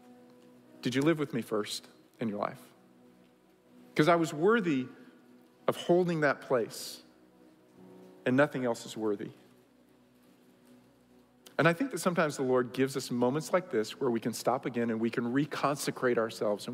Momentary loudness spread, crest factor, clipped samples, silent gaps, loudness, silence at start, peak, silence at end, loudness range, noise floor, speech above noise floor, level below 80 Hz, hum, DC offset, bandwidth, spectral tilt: 11 LU; 22 dB; under 0.1%; none; -31 LUFS; 0.1 s; -10 dBFS; 0 s; 5 LU; -63 dBFS; 33 dB; -80 dBFS; none; under 0.1%; 16 kHz; -5.5 dB/octave